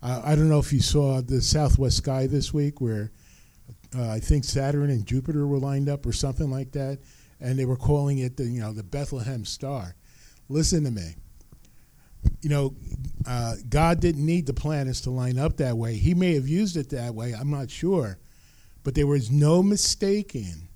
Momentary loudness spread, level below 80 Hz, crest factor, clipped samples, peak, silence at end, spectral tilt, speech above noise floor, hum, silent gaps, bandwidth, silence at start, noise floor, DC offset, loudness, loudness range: 11 LU; -34 dBFS; 20 dB; under 0.1%; -4 dBFS; 0.1 s; -6 dB/octave; 29 dB; none; none; 14 kHz; 0 s; -53 dBFS; under 0.1%; -25 LUFS; 5 LU